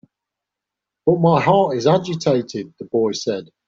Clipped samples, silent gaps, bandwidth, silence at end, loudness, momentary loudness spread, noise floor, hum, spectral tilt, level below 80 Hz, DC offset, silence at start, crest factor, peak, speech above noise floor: under 0.1%; none; 7.6 kHz; 0.25 s; -18 LUFS; 10 LU; -84 dBFS; none; -6.5 dB/octave; -58 dBFS; under 0.1%; 1.05 s; 16 dB; -4 dBFS; 67 dB